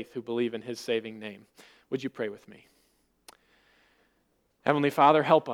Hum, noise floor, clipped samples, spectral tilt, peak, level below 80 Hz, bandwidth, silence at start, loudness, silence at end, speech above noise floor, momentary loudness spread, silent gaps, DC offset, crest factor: none; -72 dBFS; under 0.1%; -6 dB/octave; -6 dBFS; -78 dBFS; 17.5 kHz; 0 s; -27 LUFS; 0 s; 44 dB; 19 LU; none; under 0.1%; 24 dB